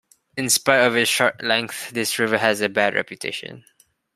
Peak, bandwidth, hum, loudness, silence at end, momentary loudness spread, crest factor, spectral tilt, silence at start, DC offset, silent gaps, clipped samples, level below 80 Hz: -2 dBFS; 15.5 kHz; none; -20 LUFS; 0.55 s; 12 LU; 20 dB; -2 dB/octave; 0.35 s; under 0.1%; none; under 0.1%; -66 dBFS